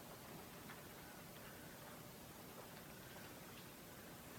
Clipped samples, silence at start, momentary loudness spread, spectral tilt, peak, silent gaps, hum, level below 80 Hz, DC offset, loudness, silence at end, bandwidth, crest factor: under 0.1%; 0 s; 1 LU; -3.5 dB/octave; -40 dBFS; none; none; -74 dBFS; under 0.1%; -55 LUFS; 0 s; 18 kHz; 16 dB